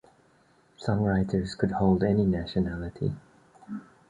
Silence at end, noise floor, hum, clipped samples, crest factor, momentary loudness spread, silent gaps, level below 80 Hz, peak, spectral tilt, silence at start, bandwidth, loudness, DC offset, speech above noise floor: 0.3 s; -62 dBFS; none; under 0.1%; 20 dB; 18 LU; none; -46 dBFS; -8 dBFS; -8.5 dB/octave; 0.8 s; 9.6 kHz; -27 LUFS; under 0.1%; 37 dB